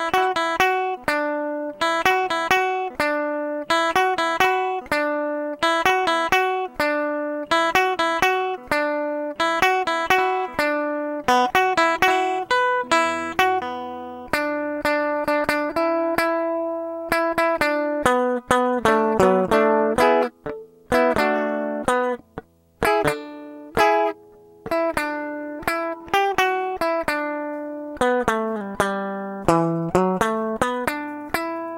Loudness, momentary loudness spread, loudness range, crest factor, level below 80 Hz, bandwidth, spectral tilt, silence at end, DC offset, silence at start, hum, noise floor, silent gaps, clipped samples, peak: -21 LUFS; 9 LU; 4 LU; 22 dB; -50 dBFS; 16.5 kHz; -4 dB/octave; 0 s; under 0.1%; 0 s; none; -48 dBFS; none; under 0.1%; 0 dBFS